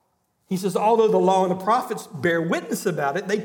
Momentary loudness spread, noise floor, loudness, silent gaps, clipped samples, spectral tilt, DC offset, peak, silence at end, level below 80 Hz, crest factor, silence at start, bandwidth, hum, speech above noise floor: 8 LU; -68 dBFS; -22 LUFS; none; under 0.1%; -5.5 dB/octave; under 0.1%; -6 dBFS; 0 s; -74 dBFS; 16 dB; 0.5 s; 18.5 kHz; none; 47 dB